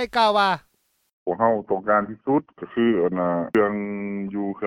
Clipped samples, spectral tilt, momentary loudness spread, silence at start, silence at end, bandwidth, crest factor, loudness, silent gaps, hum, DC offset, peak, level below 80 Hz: under 0.1%; -6.5 dB/octave; 10 LU; 0 s; 0 s; 13 kHz; 16 dB; -23 LUFS; 1.13-1.26 s; none; under 0.1%; -6 dBFS; -60 dBFS